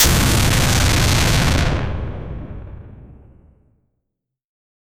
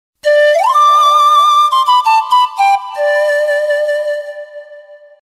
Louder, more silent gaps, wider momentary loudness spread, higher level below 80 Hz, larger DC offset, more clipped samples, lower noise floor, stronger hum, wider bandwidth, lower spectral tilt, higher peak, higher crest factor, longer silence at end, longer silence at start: second, -16 LUFS vs -10 LUFS; neither; first, 20 LU vs 11 LU; first, -24 dBFS vs -70 dBFS; neither; neither; first, -79 dBFS vs -37 dBFS; neither; first, 19.5 kHz vs 15.5 kHz; first, -3.5 dB/octave vs 3 dB/octave; about the same, 0 dBFS vs -2 dBFS; first, 18 dB vs 10 dB; first, 1.85 s vs 0.25 s; second, 0 s vs 0.25 s